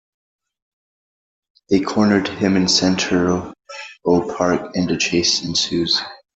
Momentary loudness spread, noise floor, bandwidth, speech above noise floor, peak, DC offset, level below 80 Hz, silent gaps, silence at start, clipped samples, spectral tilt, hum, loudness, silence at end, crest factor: 8 LU; under -90 dBFS; 8.2 kHz; over 72 dB; -2 dBFS; under 0.1%; -52 dBFS; none; 1.7 s; under 0.1%; -4 dB/octave; none; -18 LUFS; 0.2 s; 18 dB